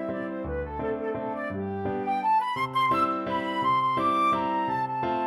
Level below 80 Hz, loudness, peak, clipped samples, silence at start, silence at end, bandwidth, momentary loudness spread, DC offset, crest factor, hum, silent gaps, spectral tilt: -50 dBFS; -27 LUFS; -14 dBFS; under 0.1%; 0 s; 0 s; 14.5 kHz; 8 LU; under 0.1%; 14 dB; none; none; -6.5 dB/octave